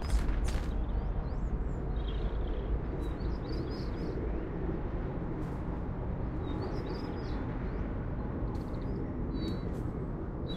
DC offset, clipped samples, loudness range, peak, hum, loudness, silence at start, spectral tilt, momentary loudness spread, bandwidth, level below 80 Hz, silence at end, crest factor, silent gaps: under 0.1%; under 0.1%; 1 LU; -18 dBFS; none; -37 LUFS; 0 s; -7.5 dB/octave; 2 LU; 10.5 kHz; -36 dBFS; 0 s; 16 dB; none